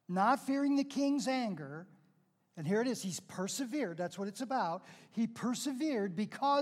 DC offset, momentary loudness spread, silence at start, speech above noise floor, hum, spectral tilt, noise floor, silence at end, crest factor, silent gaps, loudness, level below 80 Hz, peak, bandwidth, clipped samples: under 0.1%; 10 LU; 0.1 s; 38 dB; none; -5 dB/octave; -73 dBFS; 0 s; 18 dB; none; -35 LUFS; -90 dBFS; -18 dBFS; 15 kHz; under 0.1%